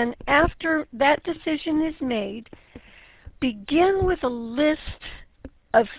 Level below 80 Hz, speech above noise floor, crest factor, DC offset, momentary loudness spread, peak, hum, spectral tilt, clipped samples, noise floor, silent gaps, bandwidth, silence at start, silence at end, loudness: -42 dBFS; 27 dB; 20 dB; under 0.1%; 15 LU; -4 dBFS; none; -9 dB/octave; under 0.1%; -50 dBFS; none; 4 kHz; 0 s; 0 s; -23 LUFS